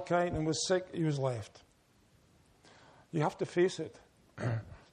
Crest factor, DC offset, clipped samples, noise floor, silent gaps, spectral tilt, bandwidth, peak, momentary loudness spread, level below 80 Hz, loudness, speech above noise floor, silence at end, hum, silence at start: 18 dB; under 0.1%; under 0.1%; -67 dBFS; none; -5.5 dB/octave; 10.5 kHz; -18 dBFS; 12 LU; -60 dBFS; -34 LUFS; 34 dB; 0.15 s; none; 0 s